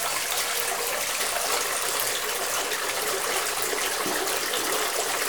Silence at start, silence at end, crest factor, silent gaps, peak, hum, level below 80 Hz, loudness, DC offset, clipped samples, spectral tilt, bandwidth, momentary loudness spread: 0 s; 0 s; 20 dB; none; -6 dBFS; none; -60 dBFS; -25 LUFS; 0.2%; under 0.1%; 0.5 dB/octave; over 20 kHz; 1 LU